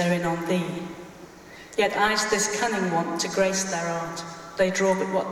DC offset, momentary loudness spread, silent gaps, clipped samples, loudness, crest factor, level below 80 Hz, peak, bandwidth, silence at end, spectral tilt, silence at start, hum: under 0.1%; 17 LU; none; under 0.1%; -25 LUFS; 16 dB; -58 dBFS; -10 dBFS; 16.5 kHz; 0 s; -3.5 dB/octave; 0 s; none